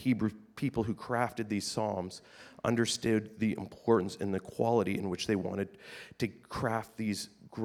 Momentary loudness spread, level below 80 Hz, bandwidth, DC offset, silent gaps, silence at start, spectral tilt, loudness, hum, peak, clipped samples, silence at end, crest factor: 10 LU; -64 dBFS; 15 kHz; under 0.1%; none; 0 s; -5.5 dB/octave; -33 LUFS; none; -12 dBFS; under 0.1%; 0 s; 20 dB